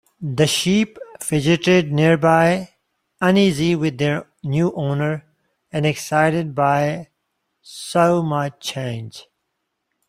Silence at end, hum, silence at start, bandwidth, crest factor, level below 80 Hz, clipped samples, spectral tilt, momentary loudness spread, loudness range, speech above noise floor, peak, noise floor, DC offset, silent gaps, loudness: 0.9 s; none; 0.2 s; 15.5 kHz; 18 dB; -54 dBFS; under 0.1%; -5.5 dB/octave; 13 LU; 4 LU; 57 dB; -2 dBFS; -75 dBFS; under 0.1%; none; -19 LUFS